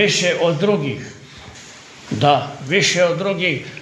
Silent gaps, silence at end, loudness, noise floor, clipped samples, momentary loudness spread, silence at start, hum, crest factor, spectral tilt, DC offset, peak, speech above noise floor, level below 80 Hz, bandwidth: none; 0 s; -17 LUFS; -40 dBFS; under 0.1%; 22 LU; 0 s; none; 18 dB; -4 dB/octave; under 0.1%; 0 dBFS; 22 dB; -56 dBFS; 11.5 kHz